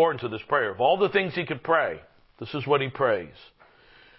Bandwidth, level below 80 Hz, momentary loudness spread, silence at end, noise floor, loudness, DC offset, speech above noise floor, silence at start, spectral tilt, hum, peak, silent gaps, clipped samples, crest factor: 5.8 kHz; -62 dBFS; 12 LU; 0.9 s; -55 dBFS; -25 LUFS; under 0.1%; 30 dB; 0 s; -9.5 dB/octave; none; -8 dBFS; none; under 0.1%; 18 dB